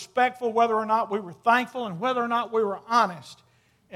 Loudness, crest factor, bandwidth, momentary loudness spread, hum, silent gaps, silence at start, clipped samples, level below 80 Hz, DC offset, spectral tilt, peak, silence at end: -25 LUFS; 18 dB; 15 kHz; 6 LU; none; none; 0 s; under 0.1%; -76 dBFS; under 0.1%; -4.5 dB/octave; -6 dBFS; 0 s